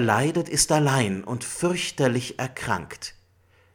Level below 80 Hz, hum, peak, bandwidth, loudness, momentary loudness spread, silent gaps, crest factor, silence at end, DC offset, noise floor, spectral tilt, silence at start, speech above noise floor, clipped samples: -52 dBFS; none; -4 dBFS; 17.5 kHz; -24 LUFS; 11 LU; none; 20 dB; 0.65 s; under 0.1%; -60 dBFS; -4 dB/octave; 0 s; 36 dB; under 0.1%